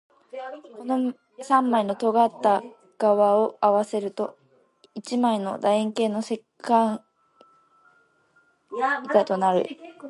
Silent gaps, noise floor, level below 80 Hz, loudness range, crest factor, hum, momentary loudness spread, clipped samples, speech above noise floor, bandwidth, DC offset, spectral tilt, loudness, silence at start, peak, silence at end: none; -63 dBFS; -76 dBFS; 5 LU; 20 dB; none; 17 LU; under 0.1%; 40 dB; 11.5 kHz; under 0.1%; -5.5 dB/octave; -23 LUFS; 0.35 s; -6 dBFS; 0 s